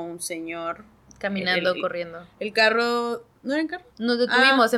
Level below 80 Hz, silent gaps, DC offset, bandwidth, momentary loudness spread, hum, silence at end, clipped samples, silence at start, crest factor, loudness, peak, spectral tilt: -64 dBFS; none; under 0.1%; 15 kHz; 15 LU; none; 0 s; under 0.1%; 0 s; 18 dB; -23 LUFS; -6 dBFS; -3.5 dB/octave